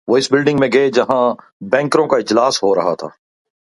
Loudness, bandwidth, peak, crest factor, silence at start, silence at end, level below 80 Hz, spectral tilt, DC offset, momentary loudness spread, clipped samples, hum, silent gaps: -15 LUFS; 11.5 kHz; 0 dBFS; 16 dB; 0.05 s; 0.7 s; -58 dBFS; -4.5 dB/octave; under 0.1%; 7 LU; under 0.1%; none; 1.52-1.60 s